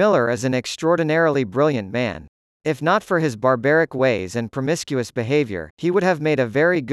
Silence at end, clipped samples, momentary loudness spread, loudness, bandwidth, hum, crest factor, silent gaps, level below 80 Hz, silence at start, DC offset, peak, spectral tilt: 0 s; under 0.1%; 8 LU; -20 LUFS; 12 kHz; none; 16 dB; 2.28-2.60 s, 5.70-5.77 s; -58 dBFS; 0 s; under 0.1%; -4 dBFS; -6 dB/octave